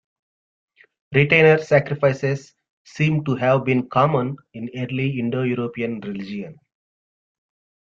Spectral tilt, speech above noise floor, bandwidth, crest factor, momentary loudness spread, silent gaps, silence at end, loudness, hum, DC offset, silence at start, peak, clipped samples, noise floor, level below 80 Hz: -7.5 dB/octave; over 70 dB; 7.4 kHz; 20 dB; 16 LU; 2.70-2.85 s; 1.35 s; -20 LUFS; none; under 0.1%; 1.1 s; -2 dBFS; under 0.1%; under -90 dBFS; -58 dBFS